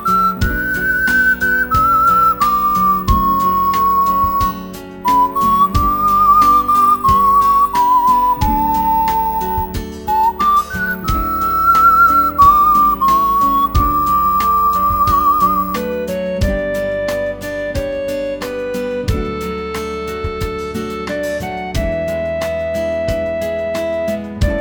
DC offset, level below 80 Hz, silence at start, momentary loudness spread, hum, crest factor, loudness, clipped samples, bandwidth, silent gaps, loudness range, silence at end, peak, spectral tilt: under 0.1%; -28 dBFS; 0 s; 12 LU; none; 14 dB; -14 LUFS; under 0.1%; 20 kHz; none; 10 LU; 0 s; 0 dBFS; -5.5 dB/octave